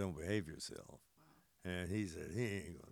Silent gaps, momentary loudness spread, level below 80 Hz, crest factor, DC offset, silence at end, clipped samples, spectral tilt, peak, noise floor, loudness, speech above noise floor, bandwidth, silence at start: none; 11 LU; -68 dBFS; 20 dB; under 0.1%; 0 s; under 0.1%; -5.5 dB/octave; -24 dBFS; -71 dBFS; -44 LUFS; 27 dB; over 20 kHz; 0 s